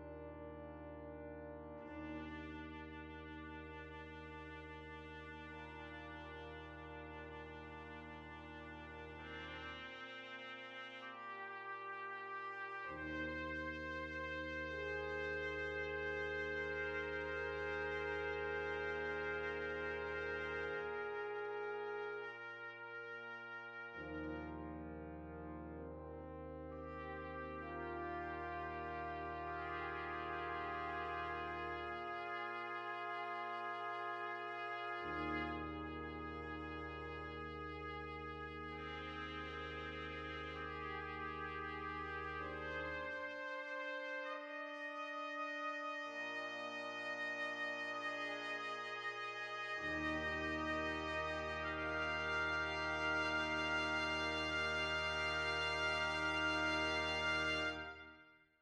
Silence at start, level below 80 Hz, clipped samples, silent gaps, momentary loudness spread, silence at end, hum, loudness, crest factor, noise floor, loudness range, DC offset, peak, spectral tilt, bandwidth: 0 s; -60 dBFS; under 0.1%; none; 14 LU; 0.25 s; none; -43 LUFS; 18 dB; -65 dBFS; 13 LU; under 0.1%; -26 dBFS; -4.5 dB/octave; 11 kHz